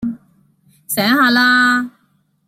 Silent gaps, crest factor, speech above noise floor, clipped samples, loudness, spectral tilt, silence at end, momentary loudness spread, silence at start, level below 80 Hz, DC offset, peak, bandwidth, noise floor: none; 16 dB; 47 dB; under 0.1%; -13 LUFS; -3 dB/octave; 0.6 s; 17 LU; 0 s; -58 dBFS; under 0.1%; -2 dBFS; 16.5 kHz; -60 dBFS